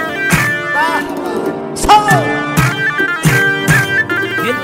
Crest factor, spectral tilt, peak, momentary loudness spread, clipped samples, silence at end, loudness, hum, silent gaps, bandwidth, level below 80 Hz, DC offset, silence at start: 14 dB; -4.5 dB/octave; 0 dBFS; 9 LU; under 0.1%; 0 s; -12 LUFS; none; none; 16.5 kHz; -34 dBFS; under 0.1%; 0 s